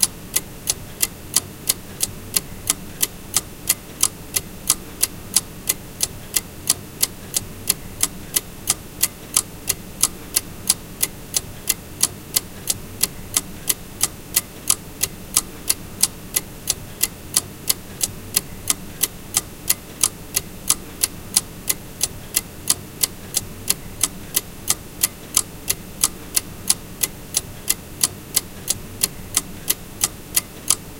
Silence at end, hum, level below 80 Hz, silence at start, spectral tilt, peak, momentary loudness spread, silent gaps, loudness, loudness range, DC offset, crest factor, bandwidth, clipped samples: 0 s; none; -42 dBFS; 0 s; -1 dB/octave; 0 dBFS; 5 LU; none; -22 LUFS; 1 LU; under 0.1%; 24 dB; 18 kHz; under 0.1%